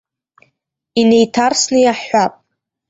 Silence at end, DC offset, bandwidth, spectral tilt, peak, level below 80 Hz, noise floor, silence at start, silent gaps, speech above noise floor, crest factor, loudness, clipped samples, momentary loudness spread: 0.6 s; under 0.1%; 8 kHz; -3.5 dB/octave; -2 dBFS; -56 dBFS; -67 dBFS; 0.95 s; none; 55 dB; 14 dB; -14 LUFS; under 0.1%; 6 LU